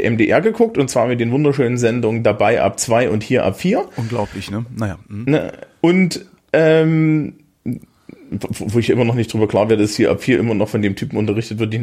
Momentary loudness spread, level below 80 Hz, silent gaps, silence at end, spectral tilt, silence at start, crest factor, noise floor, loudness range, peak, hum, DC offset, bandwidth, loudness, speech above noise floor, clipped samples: 11 LU; -50 dBFS; none; 0 s; -6 dB/octave; 0 s; 16 dB; -42 dBFS; 3 LU; -2 dBFS; none; under 0.1%; 15.5 kHz; -17 LUFS; 26 dB; under 0.1%